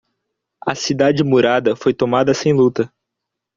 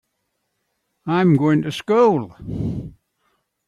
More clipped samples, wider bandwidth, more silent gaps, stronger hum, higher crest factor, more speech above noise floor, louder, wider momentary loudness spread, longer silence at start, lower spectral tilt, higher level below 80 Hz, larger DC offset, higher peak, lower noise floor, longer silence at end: neither; second, 7.6 kHz vs 12.5 kHz; neither; neither; about the same, 16 dB vs 16 dB; first, 65 dB vs 56 dB; first, -16 LUFS vs -19 LUFS; second, 10 LU vs 16 LU; second, 0.65 s vs 1.05 s; second, -5.5 dB/octave vs -8 dB/octave; second, -56 dBFS vs -48 dBFS; neither; first, 0 dBFS vs -6 dBFS; first, -80 dBFS vs -74 dBFS; about the same, 0.7 s vs 0.75 s